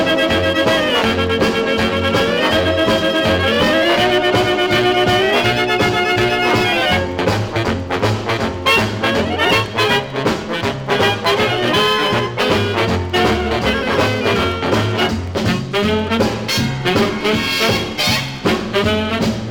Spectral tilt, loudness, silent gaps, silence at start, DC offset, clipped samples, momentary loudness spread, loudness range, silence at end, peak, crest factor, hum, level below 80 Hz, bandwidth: -4.5 dB/octave; -15 LUFS; none; 0 s; under 0.1%; under 0.1%; 5 LU; 3 LU; 0 s; -2 dBFS; 14 dB; none; -38 dBFS; over 20 kHz